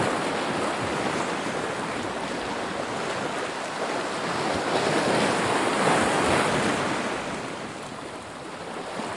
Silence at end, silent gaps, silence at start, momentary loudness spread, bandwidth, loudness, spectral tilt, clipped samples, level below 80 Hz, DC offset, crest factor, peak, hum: 0 s; none; 0 s; 13 LU; 11.5 kHz; -26 LUFS; -4 dB/octave; under 0.1%; -56 dBFS; under 0.1%; 18 dB; -8 dBFS; none